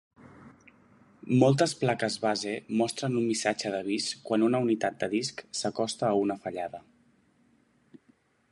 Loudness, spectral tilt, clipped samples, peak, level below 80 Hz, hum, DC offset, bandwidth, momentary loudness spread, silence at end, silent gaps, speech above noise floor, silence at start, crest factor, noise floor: -28 LUFS; -5 dB/octave; under 0.1%; -8 dBFS; -72 dBFS; none; under 0.1%; 11.5 kHz; 10 LU; 1.7 s; none; 38 dB; 0.25 s; 22 dB; -66 dBFS